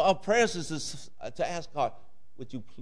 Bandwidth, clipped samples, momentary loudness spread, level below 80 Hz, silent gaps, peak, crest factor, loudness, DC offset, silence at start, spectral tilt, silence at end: 11 kHz; under 0.1%; 17 LU; -58 dBFS; none; -12 dBFS; 18 dB; -30 LUFS; 1%; 0 s; -3.5 dB/octave; 0 s